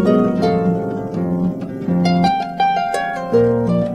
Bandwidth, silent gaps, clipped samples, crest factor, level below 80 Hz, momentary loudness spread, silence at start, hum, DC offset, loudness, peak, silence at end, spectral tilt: 10 kHz; none; under 0.1%; 14 dB; -46 dBFS; 7 LU; 0 s; none; under 0.1%; -18 LUFS; -2 dBFS; 0 s; -7.5 dB/octave